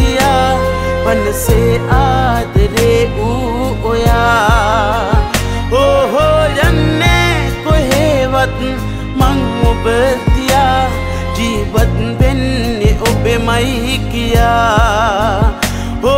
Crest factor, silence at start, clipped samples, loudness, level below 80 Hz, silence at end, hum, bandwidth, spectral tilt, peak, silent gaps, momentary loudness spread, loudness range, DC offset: 10 dB; 0 s; under 0.1%; -12 LUFS; -18 dBFS; 0 s; none; 16.5 kHz; -5.5 dB/octave; 0 dBFS; none; 5 LU; 2 LU; under 0.1%